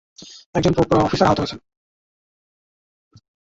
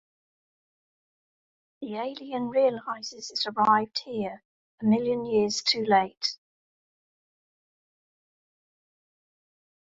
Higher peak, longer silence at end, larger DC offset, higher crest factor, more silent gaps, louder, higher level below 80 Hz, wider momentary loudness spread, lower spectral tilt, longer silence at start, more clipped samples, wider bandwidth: first, -2 dBFS vs -8 dBFS; second, 1.85 s vs 3.45 s; neither; about the same, 20 dB vs 22 dB; second, 0.46-0.53 s vs 4.45-4.78 s; first, -19 LUFS vs -27 LUFS; first, -44 dBFS vs -72 dBFS; first, 23 LU vs 12 LU; first, -6.5 dB/octave vs -4 dB/octave; second, 0.2 s vs 1.8 s; neither; about the same, 8 kHz vs 7.8 kHz